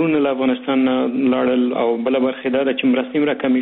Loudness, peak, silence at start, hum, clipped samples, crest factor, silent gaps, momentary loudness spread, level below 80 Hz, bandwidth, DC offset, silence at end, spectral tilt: -18 LUFS; -8 dBFS; 0 s; none; under 0.1%; 10 dB; none; 2 LU; -62 dBFS; 4 kHz; under 0.1%; 0 s; -4 dB/octave